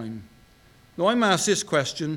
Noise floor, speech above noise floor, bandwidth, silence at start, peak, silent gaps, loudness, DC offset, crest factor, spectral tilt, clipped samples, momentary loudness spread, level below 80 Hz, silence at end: -55 dBFS; 31 dB; 18.5 kHz; 0 s; -6 dBFS; none; -22 LUFS; under 0.1%; 18 dB; -3.5 dB/octave; under 0.1%; 20 LU; -62 dBFS; 0 s